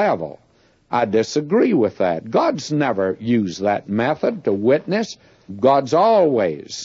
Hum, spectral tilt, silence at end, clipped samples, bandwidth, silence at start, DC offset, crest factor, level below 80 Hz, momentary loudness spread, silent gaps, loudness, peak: none; -6 dB/octave; 0 s; under 0.1%; 7.8 kHz; 0 s; under 0.1%; 16 dB; -62 dBFS; 8 LU; none; -19 LUFS; -2 dBFS